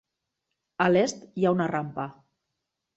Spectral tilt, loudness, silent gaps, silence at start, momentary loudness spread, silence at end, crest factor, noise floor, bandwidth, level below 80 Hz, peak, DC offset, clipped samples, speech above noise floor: -6 dB/octave; -26 LUFS; none; 0.8 s; 15 LU; 0.85 s; 20 dB; -83 dBFS; 8.2 kHz; -68 dBFS; -8 dBFS; under 0.1%; under 0.1%; 58 dB